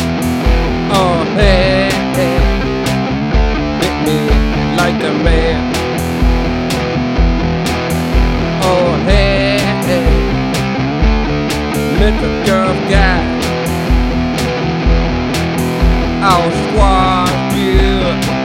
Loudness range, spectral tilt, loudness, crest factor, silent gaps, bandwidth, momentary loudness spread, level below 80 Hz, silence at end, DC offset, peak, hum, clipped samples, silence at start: 1 LU; -6 dB/octave; -13 LUFS; 12 dB; none; 16 kHz; 4 LU; -18 dBFS; 0 s; under 0.1%; 0 dBFS; none; under 0.1%; 0 s